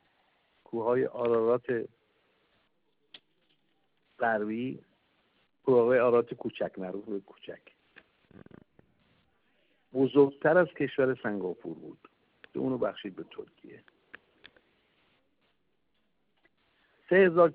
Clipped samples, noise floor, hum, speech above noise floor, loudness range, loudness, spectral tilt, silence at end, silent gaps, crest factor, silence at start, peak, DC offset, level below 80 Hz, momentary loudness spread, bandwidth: under 0.1%; -78 dBFS; none; 50 dB; 11 LU; -28 LUFS; -5.5 dB/octave; 0 s; none; 22 dB; 0.75 s; -10 dBFS; under 0.1%; -74 dBFS; 22 LU; 4.6 kHz